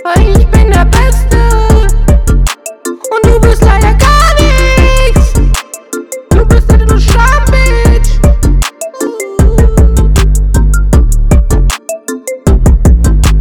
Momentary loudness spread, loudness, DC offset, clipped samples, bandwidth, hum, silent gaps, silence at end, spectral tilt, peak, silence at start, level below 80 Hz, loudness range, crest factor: 10 LU; -9 LUFS; under 0.1%; 3%; 16.5 kHz; none; none; 0 s; -5.5 dB/octave; 0 dBFS; 0 s; -8 dBFS; 2 LU; 6 dB